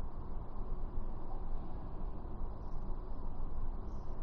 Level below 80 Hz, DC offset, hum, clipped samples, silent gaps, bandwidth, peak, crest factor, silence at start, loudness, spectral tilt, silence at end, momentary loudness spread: -38 dBFS; under 0.1%; none; under 0.1%; none; 1.9 kHz; -24 dBFS; 12 dB; 0 s; -47 LUFS; -9 dB/octave; 0 s; 2 LU